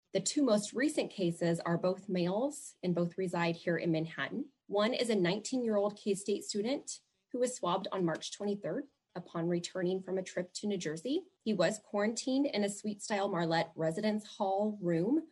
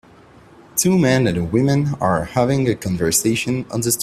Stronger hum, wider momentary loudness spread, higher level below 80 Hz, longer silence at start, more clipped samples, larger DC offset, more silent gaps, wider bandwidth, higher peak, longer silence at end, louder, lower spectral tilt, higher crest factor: neither; about the same, 7 LU vs 6 LU; second, -80 dBFS vs -46 dBFS; second, 0.15 s vs 0.75 s; neither; neither; neither; second, 12 kHz vs 16 kHz; second, -16 dBFS vs -2 dBFS; about the same, 0.05 s vs 0 s; second, -34 LUFS vs -18 LUFS; about the same, -5 dB/octave vs -5 dB/octave; about the same, 18 dB vs 16 dB